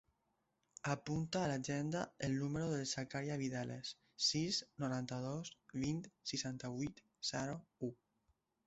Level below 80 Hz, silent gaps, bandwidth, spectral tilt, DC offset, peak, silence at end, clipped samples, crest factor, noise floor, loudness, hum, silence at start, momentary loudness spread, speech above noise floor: -70 dBFS; none; 8 kHz; -4.5 dB/octave; under 0.1%; -22 dBFS; 0.75 s; under 0.1%; 20 dB; -84 dBFS; -42 LUFS; none; 0.85 s; 9 LU; 42 dB